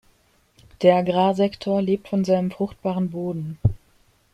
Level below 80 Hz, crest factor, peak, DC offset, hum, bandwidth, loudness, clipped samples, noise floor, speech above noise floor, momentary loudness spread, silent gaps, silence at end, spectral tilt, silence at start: -48 dBFS; 20 dB; -4 dBFS; under 0.1%; none; 9.8 kHz; -22 LUFS; under 0.1%; -61 dBFS; 40 dB; 9 LU; none; 0.6 s; -8 dB/octave; 0.8 s